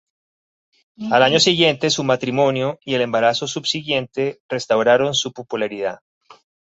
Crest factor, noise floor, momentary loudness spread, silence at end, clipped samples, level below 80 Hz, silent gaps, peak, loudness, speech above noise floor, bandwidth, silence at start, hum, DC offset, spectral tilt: 18 dB; under -90 dBFS; 11 LU; 0.8 s; under 0.1%; -62 dBFS; 4.40-4.49 s; -2 dBFS; -18 LUFS; over 71 dB; 8.2 kHz; 1 s; none; under 0.1%; -3.5 dB/octave